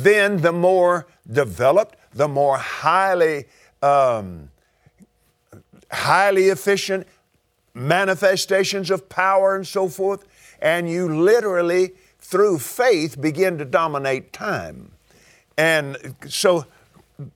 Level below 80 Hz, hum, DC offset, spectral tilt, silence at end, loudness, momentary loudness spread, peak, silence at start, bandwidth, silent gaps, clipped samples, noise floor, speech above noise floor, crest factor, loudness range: -60 dBFS; none; under 0.1%; -4.5 dB/octave; 0.05 s; -19 LUFS; 11 LU; 0 dBFS; 0 s; 18 kHz; none; under 0.1%; -65 dBFS; 46 dB; 20 dB; 3 LU